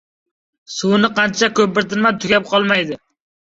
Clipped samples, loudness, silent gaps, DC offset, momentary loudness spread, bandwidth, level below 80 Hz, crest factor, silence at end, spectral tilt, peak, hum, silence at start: under 0.1%; -16 LUFS; none; under 0.1%; 9 LU; 7.8 kHz; -56 dBFS; 16 dB; 0.55 s; -4 dB/octave; -2 dBFS; none; 0.7 s